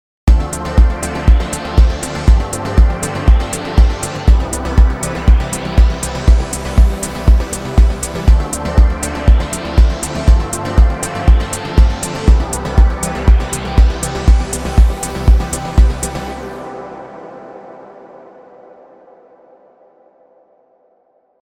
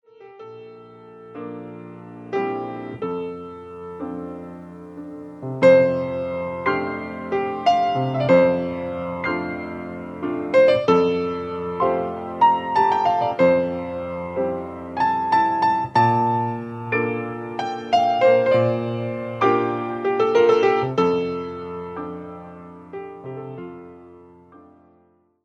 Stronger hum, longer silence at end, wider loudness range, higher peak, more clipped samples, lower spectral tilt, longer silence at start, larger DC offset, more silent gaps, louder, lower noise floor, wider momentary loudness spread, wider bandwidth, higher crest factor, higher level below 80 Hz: neither; first, 3.45 s vs 0.85 s; second, 5 LU vs 12 LU; about the same, 0 dBFS vs -2 dBFS; neither; second, -5.5 dB/octave vs -7 dB/octave; about the same, 0.25 s vs 0.2 s; neither; neither; first, -15 LUFS vs -21 LUFS; second, -56 dBFS vs -60 dBFS; second, 5 LU vs 20 LU; first, 13.5 kHz vs 8.4 kHz; second, 12 dB vs 18 dB; first, -14 dBFS vs -58 dBFS